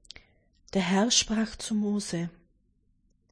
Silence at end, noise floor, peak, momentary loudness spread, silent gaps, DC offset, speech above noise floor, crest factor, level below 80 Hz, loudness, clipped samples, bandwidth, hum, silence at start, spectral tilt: 1 s; -68 dBFS; -10 dBFS; 11 LU; none; under 0.1%; 41 dB; 20 dB; -54 dBFS; -27 LUFS; under 0.1%; 10.5 kHz; none; 0.75 s; -3.5 dB/octave